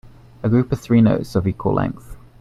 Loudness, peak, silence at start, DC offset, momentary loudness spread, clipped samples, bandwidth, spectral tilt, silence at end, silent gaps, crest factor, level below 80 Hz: -19 LUFS; -2 dBFS; 0.45 s; under 0.1%; 11 LU; under 0.1%; 12.5 kHz; -9 dB/octave; 0.2 s; none; 16 dB; -42 dBFS